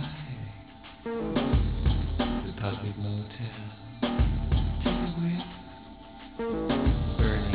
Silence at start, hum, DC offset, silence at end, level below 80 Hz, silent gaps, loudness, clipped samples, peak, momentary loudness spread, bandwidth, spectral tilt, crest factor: 0 s; none; under 0.1%; 0 s; -32 dBFS; none; -30 LUFS; under 0.1%; -12 dBFS; 17 LU; 4 kHz; -11 dB/octave; 16 dB